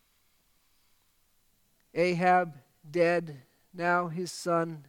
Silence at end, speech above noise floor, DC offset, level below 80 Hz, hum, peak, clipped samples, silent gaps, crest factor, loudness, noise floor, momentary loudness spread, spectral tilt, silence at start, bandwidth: 0.05 s; 41 dB; under 0.1%; -78 dBFS; none; -10 dBFS; under 0.1%; none; 20 dB; -29 LUFS; -69 dBFS; 15 LU; -5.5 dB/octave; 1.95 s; 16.5 kHz